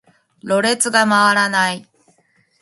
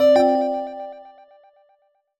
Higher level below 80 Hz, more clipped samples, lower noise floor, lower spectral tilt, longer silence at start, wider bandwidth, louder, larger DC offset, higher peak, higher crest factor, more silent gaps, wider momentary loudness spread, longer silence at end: second, -68 dBFS vs -62 dBFS; neither; second, -60 dBFS vs -64 dBFS; second, -2.5 dB/octave vs -5 dB/octave; first, 0.45 s vs 0 s; second, 12 kHz vs 17 kHz; first, -15 LUFS vs -20 LUFS; neither; first, 0 dBFS vs -6 dBFS; about the same, 18 dB vs 16 dB; neither; second, 12 LU vs 22 LU; second, 0.8 s vs 1.2 s